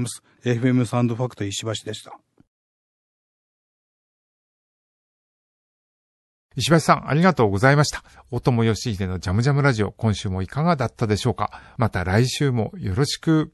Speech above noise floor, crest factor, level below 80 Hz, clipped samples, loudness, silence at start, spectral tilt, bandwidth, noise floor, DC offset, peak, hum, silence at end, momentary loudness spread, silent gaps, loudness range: over 69 dB; 22 dB; -44 dBFS; under 0.1%; -21 LUFS; 0 s; -6 dB/octave; 12.5 kHz; under -90 dBFS; under 0.1%; -2 dBFS; none; 0.05 s; 11 LU; 2.47-6.49 s; 10 LU